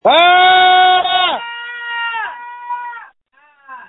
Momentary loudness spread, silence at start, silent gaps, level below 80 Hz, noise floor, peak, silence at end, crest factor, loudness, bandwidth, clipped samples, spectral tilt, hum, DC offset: 18 LU; 0.05 s; none; -60 dBFS; -53 dBFS; 0 dBFS; 0.05 s; 14 dB; -11 LUFS; 4.1 kHz; under 0.1%; -4 dB/octave; none; under 0.1%